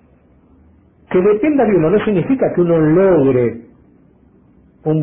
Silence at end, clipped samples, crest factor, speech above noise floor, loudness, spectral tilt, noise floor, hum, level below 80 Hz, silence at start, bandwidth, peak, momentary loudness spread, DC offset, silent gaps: 0 s; under 0.1%; 12 dB; 37 dB; -14 LUFS; -13.5 dB/octave; -50 dBFS; none; -46 dBFS; 1.1 s; 3.7 kHz; -4 dBFS; 8 LU; under 0.1%; none